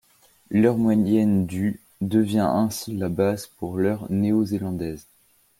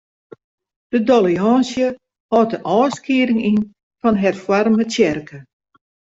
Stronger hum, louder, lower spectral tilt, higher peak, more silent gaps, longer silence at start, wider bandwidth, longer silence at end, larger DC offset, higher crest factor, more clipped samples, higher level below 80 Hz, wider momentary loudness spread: neither; second, -23 LUFS vs -17 LUFS; about the same, -7 dB/octave vs -6 dB/octave; second, -6 dBFS vs -2 dBFS; second, none vs 2.20-2.29 s, 3.83-3.91 s; second, 0.5 s vs 0.9 s; first, 16 kHz vs 7.8 kHz; second, 0.6 s vs 0.8 s; neither; about the same, 18 dB vs 16 dB; neither; about the same, -56 dBFS vs -56 dBFS; first, 11 LU vs 7 LU